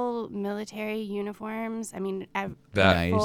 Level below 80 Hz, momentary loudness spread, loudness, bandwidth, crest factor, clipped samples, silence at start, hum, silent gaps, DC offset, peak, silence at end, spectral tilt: -52 dBFS; 12 LU; -29 LUFS; 19 kHz; 22 dB; under 0.1%; 0 s; none; none; under 0.1%; -6 dBFS; 0 s; -5.5 dB/octave